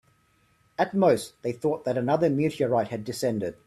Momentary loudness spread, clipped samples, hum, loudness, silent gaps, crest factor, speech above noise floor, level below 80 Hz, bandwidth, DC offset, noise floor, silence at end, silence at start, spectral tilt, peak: 7 LU; under 0.1%; none; -26 LUFS; none; 18 dB; 40 dB; -64 dBFS; 14 kHz; under 0.1%; -65 dBFS; 0.15 s; 0.8 s; -6.5 dB/octave; -8 dBFS